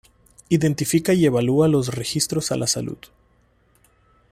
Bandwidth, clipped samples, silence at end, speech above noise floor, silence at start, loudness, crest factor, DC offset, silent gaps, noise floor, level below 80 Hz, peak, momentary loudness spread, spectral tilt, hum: 16 kHz; under 0.1%; 1.35 s; 40 dB; 0.5 s; -20 LUFS; 16 dB; under 0.1%; none; -60 dBFS; -54 dBFS; -6 dBFS; 7 LU; -5 dB/octave; none